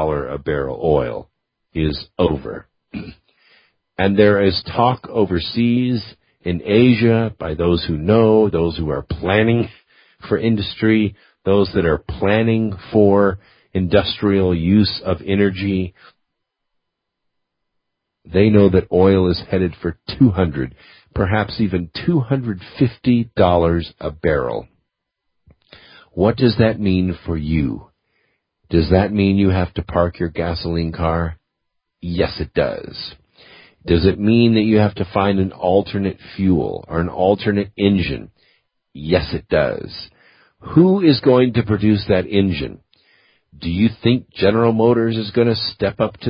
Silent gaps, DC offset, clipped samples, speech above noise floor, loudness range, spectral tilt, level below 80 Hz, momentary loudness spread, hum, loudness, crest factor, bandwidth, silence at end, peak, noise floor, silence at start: none; under 0.1%; under 0.1%; 59 dB; 5 LU; -12 dB/octave; -34 dBFS; 13 LU; none; -17 LUFS; 18 dB; 5.4 kHz; 0 s; 0 dBFS; -76 dBFS; 0 s